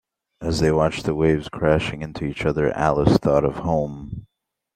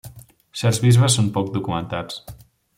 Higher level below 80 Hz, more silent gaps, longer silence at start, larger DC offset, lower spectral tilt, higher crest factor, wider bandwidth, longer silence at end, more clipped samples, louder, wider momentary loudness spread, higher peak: first, -40 dBFS vs -50 dBFS; neither; first, 0.4 s vs 0.05 s; neither; first, -7 dB/octave vs -5 dB/octave; about the same, 20 dB vs 18 dB; second, 13.5 kHz vs 15.5 kHz; about the same, 0.5 s vs 0.45 s; neither; about the same, -21 LUFS vs -19 LUFS; second, 12 LU vs 18 LU; about the same, -2 dBFS vs -4 dBFS